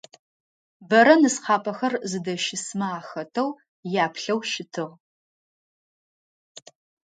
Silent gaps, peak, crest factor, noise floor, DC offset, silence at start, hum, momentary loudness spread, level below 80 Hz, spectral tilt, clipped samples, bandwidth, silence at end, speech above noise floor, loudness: 3.68-3.83 s, 5.00-6.55 s; -2 dBFS; 22 dB; under -90 dBFS; under 0.1%; 0.8 s; none; 16 LU; -76 dBFS; -4 dB/octave; under 0.1%; 9.4 kHz; 0.45 s; over 67 dB; -23 LUFS